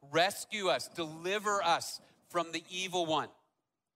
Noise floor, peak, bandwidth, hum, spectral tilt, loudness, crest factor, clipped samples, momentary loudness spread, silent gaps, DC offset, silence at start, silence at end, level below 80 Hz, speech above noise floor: -84 dBFS; -16 dBFS; 16 kHz; none; -2.5 dB/octave; -34 LUFS; 20 dB; under 0.1%; 9 LU; none; under 0.1%; 0.05 s; 0.65 s; -80 dBFS; 50 dB